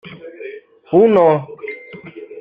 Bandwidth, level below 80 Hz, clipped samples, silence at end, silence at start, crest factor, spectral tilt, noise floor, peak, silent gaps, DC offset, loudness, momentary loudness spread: 5 kHz; -60 dBFS; under 0.1%; 0 s; 0.05 s; 16 dB; -9.5 dB/octave; -35 dBFS; -2 dBFS; none; under 0.1%; -13 LUFS; 24 LU